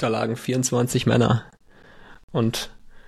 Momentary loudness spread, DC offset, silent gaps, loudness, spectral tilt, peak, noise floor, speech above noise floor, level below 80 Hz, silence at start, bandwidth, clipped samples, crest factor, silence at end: 10 LU; under 0.1%; 2.23-2.28 s; -23 LUFS; -5 dB/octave; -6 dBFS; -47 dBFS; 26 dB; -50 dBFS; 0 s; 14.5 kHz; under 0.1%; 18 dB; 0.1 s